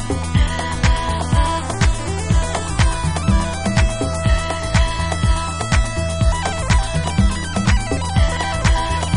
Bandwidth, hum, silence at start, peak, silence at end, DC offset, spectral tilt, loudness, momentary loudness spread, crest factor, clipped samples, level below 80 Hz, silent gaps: 11 kHz; none; 0 s; -2 dBFS; 0 s; under 0.1%; -5 dB/octave; -19 LUFS; 2 LU; 16 dB; under 0.1%; -20 dBFS; none